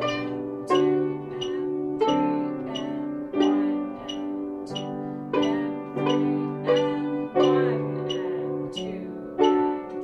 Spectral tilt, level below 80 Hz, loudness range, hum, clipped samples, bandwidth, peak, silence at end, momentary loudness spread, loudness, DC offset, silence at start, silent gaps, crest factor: -6.5 dB/octave; -62 dBFS; 3 LU; none; under 0.1%; 8.4 kHz; -8 dBFS; 0 s; 10 LU; -26 LUFS; under 0.1%; 0 s; none; 18 dB